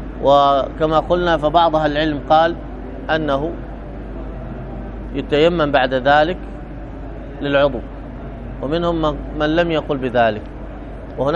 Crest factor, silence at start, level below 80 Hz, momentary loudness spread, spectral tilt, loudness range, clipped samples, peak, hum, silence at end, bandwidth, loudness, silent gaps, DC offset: 18 dB; 0 s; -32 dBFS; 18 LU; -7 dB/octave; 5 LU; under 0.1%; 0 dBFS; none; 0 s; 7.6 kHz; -17 LUFS; none; under 0.1%